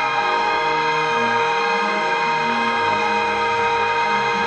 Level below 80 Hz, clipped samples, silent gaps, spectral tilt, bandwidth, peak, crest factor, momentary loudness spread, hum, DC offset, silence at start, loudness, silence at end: -58 dBFS; under 0.1%; none; -3 dB/octave; 9 kHz; -6 dBFS; 14 dB; 1 LU; none; under 0.1%; 0 s; -19 LUFS; 0 s